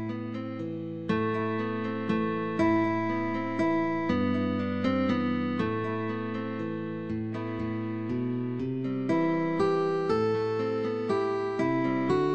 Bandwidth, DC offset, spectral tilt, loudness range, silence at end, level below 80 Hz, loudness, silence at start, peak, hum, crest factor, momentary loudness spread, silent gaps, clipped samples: 8.6 kHz; 0.3%; -8 dB/octave; 4 LU; 0 s; -60 dBFS; -29 LUFS; 0 s; -14 dBFS; none; 14 dB; 7 LU; none; under 0.1%